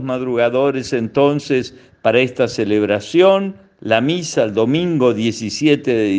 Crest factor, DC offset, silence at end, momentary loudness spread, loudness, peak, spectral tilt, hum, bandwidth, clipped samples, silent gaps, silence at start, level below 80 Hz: 16 dB; under 0.1%; 0 s; 7 LU; -16 LUFS; 0 dBFS; -5.5 dB/octave; none; 9.6 kHz; under 0.1%; none; 0 s; -58 dBFS